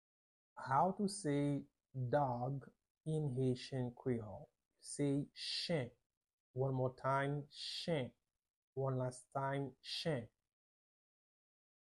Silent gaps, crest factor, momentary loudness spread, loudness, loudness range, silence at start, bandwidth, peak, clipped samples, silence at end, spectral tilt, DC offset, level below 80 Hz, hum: 2.90-2.95 s, 6.06-6.10 s, 6.17-6.21 s, 6.33-6.54 s, 8.50-8.76 s; 20 dB; 14 LU; -41 LUFS; 4 LU; 0.55 s; 11.5 kHz; -22 dBFS; under 0.1%; 1.55 s; -6 dB/octave; under 0.1%; -72 dBFS; none